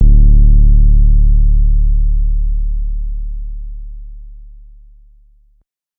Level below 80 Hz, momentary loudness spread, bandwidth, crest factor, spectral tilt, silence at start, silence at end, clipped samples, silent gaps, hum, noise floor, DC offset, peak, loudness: -10 dBFS; 21 LU; 0.5 kHz; 10 dB; -18.5 dB/octave; 0 s; 1.55 s; under 0.1%; none; none; -56 dBFS; under 0.1%; 0 dBFS; -15 LUFS